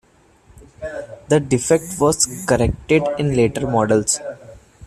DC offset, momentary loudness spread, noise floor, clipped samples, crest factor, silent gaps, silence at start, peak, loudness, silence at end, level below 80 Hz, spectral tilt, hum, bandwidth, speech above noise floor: under 0.1%; 15 LU; -52 dBFS; under 0.1%; 18 dB; none; 0.55 s; -2 dBFS; -18 LUFS; 0 s; -40 dBFS; -4.5 dB/octave; none; 14.5 kHz; 34 dB